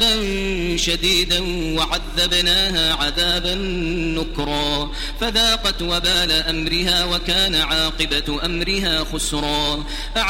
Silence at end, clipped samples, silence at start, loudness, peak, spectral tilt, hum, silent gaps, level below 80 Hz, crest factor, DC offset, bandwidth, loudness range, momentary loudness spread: 0 s; under 0.1%; 0 s; -18 LUFS; -4 dBFS; -3 dB/octave; none; none; -28 dBFS; 16 dB; under 0.1%; 16.5 kHz; 2 LU; 7 LU